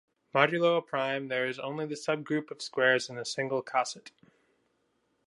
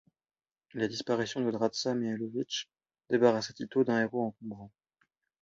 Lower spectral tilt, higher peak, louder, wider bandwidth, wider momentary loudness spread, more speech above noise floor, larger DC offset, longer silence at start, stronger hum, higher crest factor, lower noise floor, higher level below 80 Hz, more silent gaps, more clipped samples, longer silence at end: about the same, -4 dB/octave vs -5 dB/octave; first, -6 dBFS vs -10 dBFS; about the same, -30 LUFS vs -31 LUFS; first, 11.5 kHz vs 7.6 kHz; second, 10 LU vs 18 LU; second, 45 dB vs over 59 dB; neither; second, 0.35 s vs 0.75 s; neither; about the same, 26 dB vs 22 dB; second, -75 dBFS vs under -90 dBFS; second, -82 dBFS vs -74 dBFS; neither; neither; first, 1.2 s vs 0.75 s